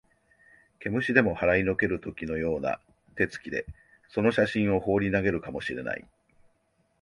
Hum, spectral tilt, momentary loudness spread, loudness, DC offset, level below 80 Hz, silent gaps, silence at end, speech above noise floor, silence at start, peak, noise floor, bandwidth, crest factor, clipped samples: none; -7 dB/octave; 12 LU; -28 LUFS; under 0.1%; -52 dBFS; none; 1 s; 43 dB; 0.8 s; -4 dBFS; -70 dBFS; 11 kHz; 24 dB; under 0.1%